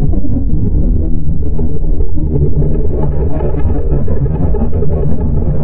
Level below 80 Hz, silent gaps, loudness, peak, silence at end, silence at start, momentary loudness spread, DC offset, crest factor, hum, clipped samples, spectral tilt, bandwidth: -14 dBFS; none; -16 LUFS; 0 dBFS; 0 s; 0 s; 4 LU; under 0.1%; 8 dB; none; under 0.1%; -14.5 dB/octave; 1.8 kHz